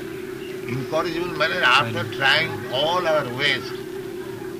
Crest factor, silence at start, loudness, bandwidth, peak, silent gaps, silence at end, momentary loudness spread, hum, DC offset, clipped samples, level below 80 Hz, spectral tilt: 18 dB; 0 s; -21 LUFS; 15.5 kHz; -4 dBFS; none; 0 s; 15 LU; none; under 0.1%; under 0.1%; -54 dBFS; -4 dB/octave